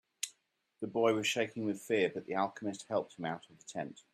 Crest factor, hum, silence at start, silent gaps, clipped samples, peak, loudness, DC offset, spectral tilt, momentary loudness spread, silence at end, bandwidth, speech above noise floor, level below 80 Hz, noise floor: 20 dB; none; 0.25 s; none; under 0.1%; -16 dBFS; -36 LUFS; under 0.1%; -4 dB/octave; 12 LU; 0.15 s; 14.5 kHz; 42 dB; -82 dBFS; -77 dBFS